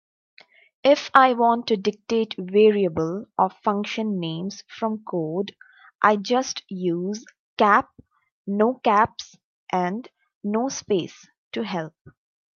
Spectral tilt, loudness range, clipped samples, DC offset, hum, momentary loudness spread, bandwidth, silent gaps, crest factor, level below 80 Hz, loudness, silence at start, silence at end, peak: -5 dB/octave; 5 LU; under 0.1%; under 0.1%; none; 16 LU; 7.2 kHz; 5.95-5.99 s, 7.39-7.57 s, 8.32-8.45 s, 9.44-9.67 s, 10.35-10.41 s, 11.38-11.51 s, 12.01-12.05 s; 22 dB; -66 dBFS; -22 LUFS; 0.85 s; 0.45 s; 0 dBFS